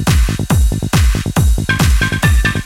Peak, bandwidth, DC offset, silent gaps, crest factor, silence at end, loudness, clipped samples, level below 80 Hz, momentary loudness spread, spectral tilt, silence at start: 0 dBFS; 17 kHz; under 0.1%; none; 12 dB; 0 s; -14 LUFS; under 0.1%; -16 dBFS; 2 LU; -5 dB/octave; 0 s